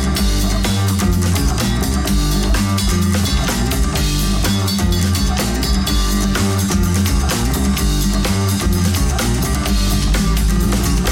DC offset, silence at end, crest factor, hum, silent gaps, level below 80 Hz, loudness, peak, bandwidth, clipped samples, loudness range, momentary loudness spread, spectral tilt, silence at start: 0.5%; 0 s; 10 dB; none; none; -20 dBFS; -17 LUFS; -4 dBFS; 17.5 kHz; under 0.1%; 0 LU; 1 LU; -4.5 dB/octave; 0 s